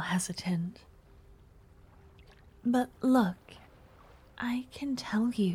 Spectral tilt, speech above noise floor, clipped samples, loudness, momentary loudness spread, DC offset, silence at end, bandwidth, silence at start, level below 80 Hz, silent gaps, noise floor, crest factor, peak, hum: -5.5 dB/octave; 27 dB; under 0.1%; -31 LUFS; 14 LU; under 0.1%; 0 s; 15.5 kHz; 0 s; -60 dBFS; none; -57 dBFS; 18 dB; -14 dBFS; none